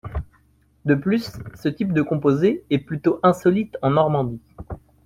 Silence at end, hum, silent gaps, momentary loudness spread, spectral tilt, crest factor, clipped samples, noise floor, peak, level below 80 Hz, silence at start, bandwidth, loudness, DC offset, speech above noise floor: 0.25 s; none; none; 16 LU; -8 dB/octave; 16 dB; under 0.1%; -59 dBFS; -4 dBFS; -44 dBFS; 0.05 s; 15.5 kHz; -21 LUFS; under 0.1%; 39 dB